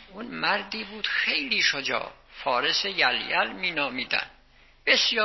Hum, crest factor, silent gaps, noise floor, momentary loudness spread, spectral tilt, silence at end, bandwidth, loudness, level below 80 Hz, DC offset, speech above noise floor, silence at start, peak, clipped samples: none; 20 dB; none; -56 dBFS; 10 LU; -1.5 dB/octave; 0 s; 6.2 kHz; -25 LUFS; -60 dBFS; under 0.1%; 30 dB; 0 s; -8 dBFS; under 0.1%